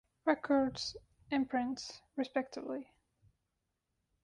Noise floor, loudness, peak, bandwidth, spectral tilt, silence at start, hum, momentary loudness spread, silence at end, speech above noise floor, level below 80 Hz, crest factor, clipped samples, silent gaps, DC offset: -85 dBFS; -36 LUFS; -18 dBFS; 10.5 kHz; -4 dB/octave; 0.25 s; none; 12 LU; 1.4 s; 50 dB; -68 dBFS; 20 dB; under 0.1%; none; under 0.1%